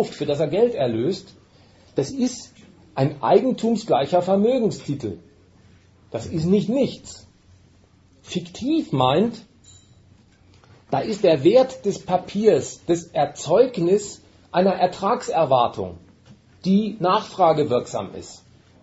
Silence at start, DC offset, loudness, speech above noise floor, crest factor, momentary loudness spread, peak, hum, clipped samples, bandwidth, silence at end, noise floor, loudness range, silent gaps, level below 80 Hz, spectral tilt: 0 s; under 0.1%; -21 LUFS; 34 dB; 18 dB; 14 LU; -4 dBFS; none; under 0.1%; 8 kHz; 0.45 s; -55 dBFS; 6 LU; none; -58 dBFS; -6 dB/octave